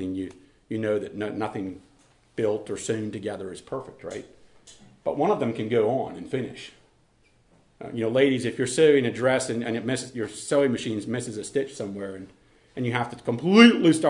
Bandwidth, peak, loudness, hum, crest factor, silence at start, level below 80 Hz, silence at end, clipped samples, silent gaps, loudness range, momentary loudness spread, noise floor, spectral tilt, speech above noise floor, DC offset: 11 kHz; -2 dBFS; -25 LUFS; none; 24 dB; 0 s; -64 dBFS; 0 s; under 0.1%; none; 8 LU; 18 LU; -62 dBFS; -5 dB/octave; 38 dB; under 0.1%